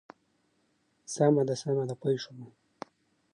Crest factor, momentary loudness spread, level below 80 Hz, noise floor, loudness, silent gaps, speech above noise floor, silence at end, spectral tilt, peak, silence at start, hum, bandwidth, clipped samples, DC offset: 20 dB; 23 LU; -80 dBFS; -73 dBFS; -29 LUFS; none; 44 dB; 0.85 s; -6 dB/octave; -12 dBFS; 1.1 s; none; 11.5 kHz; under 0.1%; under 0.1%